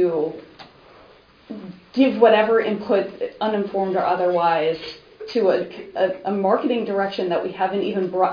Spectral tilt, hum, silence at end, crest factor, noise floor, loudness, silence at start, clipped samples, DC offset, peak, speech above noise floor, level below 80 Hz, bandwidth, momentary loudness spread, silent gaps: -7.5 dB/octave; none; 0 s; 20 dB; -50 dBFS; -21 LUFS; 0 s; under 0.1%; under 0.1%; 0 dBFS; 30 dB; -64 dBFS; 5.2 kHz; 14 LU; none